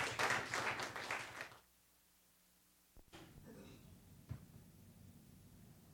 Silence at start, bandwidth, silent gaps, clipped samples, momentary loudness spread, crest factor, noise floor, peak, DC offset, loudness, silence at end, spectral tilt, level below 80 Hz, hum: 0 s; over 20 kHz; none; under 0.1%; 25 LU; 24 dB; -73 dBFS; -24 dBFS; under 0.1%; -42 LUFS; 0 s; -2.5 dB/octave; -72 dBFS; none